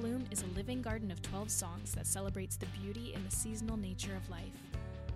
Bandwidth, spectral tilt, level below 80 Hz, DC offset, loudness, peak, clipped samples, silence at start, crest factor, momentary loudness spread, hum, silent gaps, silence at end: 15 kHz; -4.5 dB/octave; -50 dBFS; under 0.1%; -40 LUFS; -20 dBFS; under 0.1%; 0 s; 20 dB; 8 LU; none; none; 0 s